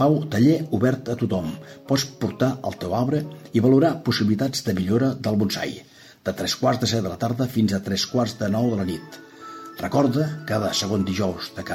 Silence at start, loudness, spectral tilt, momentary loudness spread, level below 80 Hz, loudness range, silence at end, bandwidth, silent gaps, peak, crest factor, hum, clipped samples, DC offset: 0 s; -23 LUFS; -6 dB/octave; 13 LU; -56 dBFS; 3 LU; 0 s; 16.5 kHz; none; -6 dBFS; 16 dB; none; under 0.1%; under 0.1%